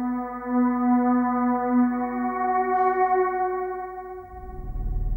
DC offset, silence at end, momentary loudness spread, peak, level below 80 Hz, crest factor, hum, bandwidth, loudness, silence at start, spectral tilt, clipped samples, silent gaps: under 0.1%; 0 s; 16 LU; -10 dBFS; -36 dBFS; 14 dB; none; 2.4 kHz; -24 LUFS; 0 s; -11 dB/octave; under 0.1%; none